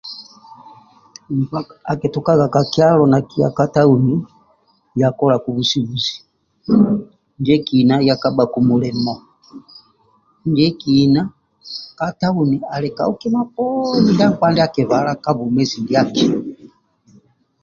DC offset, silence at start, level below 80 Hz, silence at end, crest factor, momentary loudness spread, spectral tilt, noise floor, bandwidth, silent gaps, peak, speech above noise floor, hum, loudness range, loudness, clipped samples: under 0.1%; 0.05 s; -52 dBFS; 0.95 s; 16 dB; 12 LU; -7 dB/octave; -58 dBFS; 7.2 kHz; none; 0 dBFS; 42 dB; none; 3 LU; -16 LUFS; under 0.1%